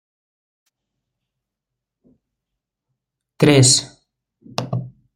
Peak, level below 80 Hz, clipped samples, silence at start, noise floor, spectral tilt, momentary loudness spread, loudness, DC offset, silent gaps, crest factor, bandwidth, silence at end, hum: -2 dBFS; -56 dBFS; under 0.1%; 3.4 s; -83 dBFS; -4 dB/octave; 17 LU; -15 LUFS; under 0.1%; none; 22 dB; 15.5 kHz; 0.25 s; none